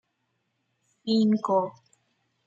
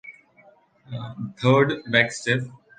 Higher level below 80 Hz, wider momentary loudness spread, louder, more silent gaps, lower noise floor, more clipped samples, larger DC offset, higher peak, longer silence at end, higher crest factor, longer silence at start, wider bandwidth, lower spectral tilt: second, -76 dBFS vs -62 dBFS; second, 13 LU vs 16 LU; second, -25 LUFS vs -21 LUFS; neither; first, -76 dBFS vs -56 dBFS; neither; neither; second, -12 dBFS vs -2 dBFS; first, 0.75 s vs 0.25 s; about the same, 18 dB vs 22 dB; first, 1.05 s vs 0.05 s; second, 7.4 kHz vs 9.6 kHz; first, -7 dB/octave vs -5.5 dB/octave